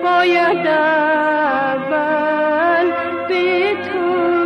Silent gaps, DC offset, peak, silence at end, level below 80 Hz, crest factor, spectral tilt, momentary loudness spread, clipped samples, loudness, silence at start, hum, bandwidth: none; under 0.1%; -6 dBFS; 0 s; -58 dBFS; 10 dB; -6 dB/octave; 5 LU; under 0.1%; -16 LUFS; 0 s; none; 6.6 kHz